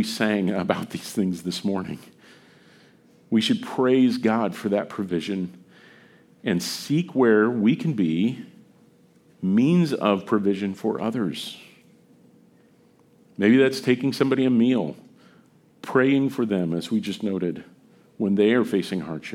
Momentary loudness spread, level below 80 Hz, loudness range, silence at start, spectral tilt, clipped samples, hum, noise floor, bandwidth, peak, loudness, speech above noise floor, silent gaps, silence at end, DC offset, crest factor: 11 LU; -68 dBFS; 4 LU; 0 s; -6 dB/octave; under 0.1%; none; -57 dBFS; 16 kHz; -2 dBFS; -23 LUFS; 35 dB; none; 0 s; under 0.1%; 22 dB